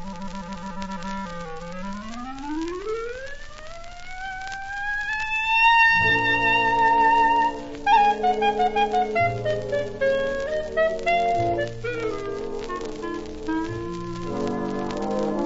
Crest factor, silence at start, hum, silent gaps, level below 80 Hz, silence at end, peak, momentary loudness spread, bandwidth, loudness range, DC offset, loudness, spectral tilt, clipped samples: 16 dB; 0 s; none; none; -42 dBFS; 0 s; -8 dBFS; 17 LU; 8 kHz; 14 LU; under 0.1%; -23 LUFS; -5 dB/octave; under 0.1%